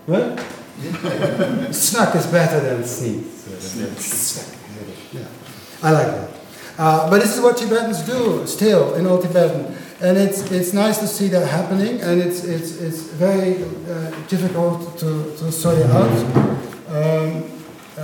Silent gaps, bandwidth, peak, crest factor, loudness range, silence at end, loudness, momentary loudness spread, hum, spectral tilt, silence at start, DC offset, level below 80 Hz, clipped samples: none; 18 kHz; 0 dBFS; 18 dB; 5 LU; 0 s; -19 LUFS; 18 LU; none; -5.5 dB/octave; 0.05 s; under 0.1%; -58 dBFS; under 0.1%